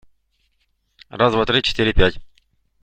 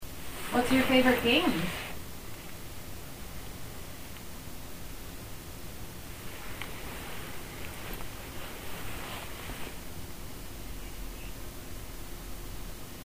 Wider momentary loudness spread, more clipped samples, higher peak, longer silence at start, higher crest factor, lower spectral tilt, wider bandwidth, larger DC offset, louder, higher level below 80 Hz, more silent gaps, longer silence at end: second, 4 LU vs 18 LU; neither; first, -2 dBFS vs -12 dBFS; first, 1.15 s vs 0 s; about the same, 18 dB vs 22 dB; first, -5.5 dB/octave vs -4 dB/octave; second, 8.8 kHz vs 16 kHz; second, under 0.1% vs 0.6%; first, -18 LUFS vs -35 LUFS; first, -30 dBFS vs -46 dBFS; neither; first, 0.55 s vs 0 s